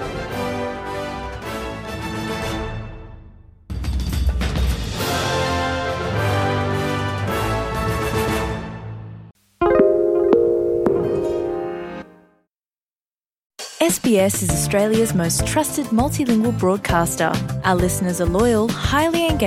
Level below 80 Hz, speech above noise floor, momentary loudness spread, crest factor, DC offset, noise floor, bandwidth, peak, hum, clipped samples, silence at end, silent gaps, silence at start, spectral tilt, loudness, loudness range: -32 dBFS; over 72 dB; 13 LU; 18 dB; under 0.1%; under -90 dBFS; 16.5 kHz; -2 dBFS; none; under 0.1%; 0 s; 12.83-12.87 s, 13.01-13.05 s, 13.46-13.50 s; 0 s; -5 dB/octave; -20 LUFS; 7 LU